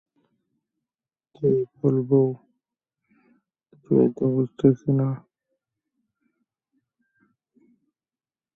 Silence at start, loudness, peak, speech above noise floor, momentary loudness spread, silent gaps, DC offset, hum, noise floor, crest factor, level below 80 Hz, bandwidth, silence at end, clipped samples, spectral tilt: 1.4 s; -22 LUFS; -4 dBFS; over 69 dB; 7 LU; none; under 0.1%; none; under -90 dBFS; 22 dB; -64 dBFS; 3.7 kHz; 3.35 s; under 0.1%; -12 dB/octave